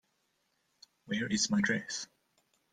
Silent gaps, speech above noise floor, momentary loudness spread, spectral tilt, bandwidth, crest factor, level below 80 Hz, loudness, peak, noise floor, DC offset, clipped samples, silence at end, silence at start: none; 45 dB; 11 LU; -3 dB/octave; 9.8 kHz; 18 dB; -70 dBFS; -32 LUFS; -18 dBFS; -78 dBFS; under 0.1%; under 0.1%; 0.7 s; 1.05 s